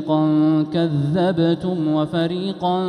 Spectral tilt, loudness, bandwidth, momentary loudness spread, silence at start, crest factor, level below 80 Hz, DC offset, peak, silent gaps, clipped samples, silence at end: -8.5 dB/octave; -19 LUFS; 9.6 kHz; 5 LU; 0 s; 12 dB; -56 dBFS; under 0.1%; -6 dBFS; none; under 0.1%; 0 s